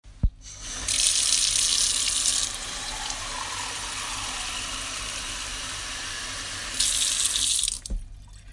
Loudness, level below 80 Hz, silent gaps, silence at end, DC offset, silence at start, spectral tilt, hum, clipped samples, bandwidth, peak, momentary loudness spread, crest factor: -24 LUFS; -38 dBFS; none; 0 s; under 0.1%; 0.05 s; 0.5 dB/octave; none; under 0.1%; 12 kHz; -4 dBFS; 12 LU; 24 dB